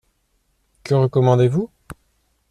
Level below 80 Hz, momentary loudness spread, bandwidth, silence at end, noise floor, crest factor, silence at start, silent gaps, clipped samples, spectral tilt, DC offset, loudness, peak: -52 dBFS; 16 LU; 10.5 kHz; 0.85 s; -66 dBFS; 16 dB; 0.85 s; none; under 0.1%; -8.5 dB/octave; under 0.1%; -18 LUFS; -4 dBFS